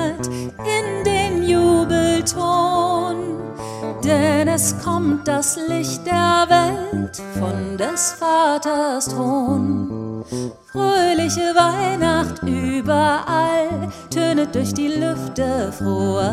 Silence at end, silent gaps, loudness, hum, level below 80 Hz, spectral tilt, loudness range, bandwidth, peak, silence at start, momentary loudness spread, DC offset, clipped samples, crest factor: 0 s; none; -19 LUFS; none; -44 dBFS; -4.5 dB/octave; 2 LU; 16 kHz; 0 dBFS; 0 s; 10 LU; under 0.1%; under 0.1%; 18 dB